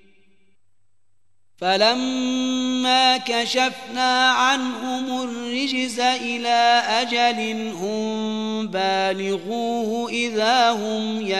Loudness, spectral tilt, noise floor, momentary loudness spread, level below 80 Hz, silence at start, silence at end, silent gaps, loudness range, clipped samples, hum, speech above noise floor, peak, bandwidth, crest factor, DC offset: -21 LUFS; -2.5 dB/octave; -75 dBFS; 9 LU; -70 dBFS; 1.6 s; 0 s; none; 3 LU; under 0.1%; none; 54 dB; -4 dBFS; 12.5 kHz; 18 dB; 0.3%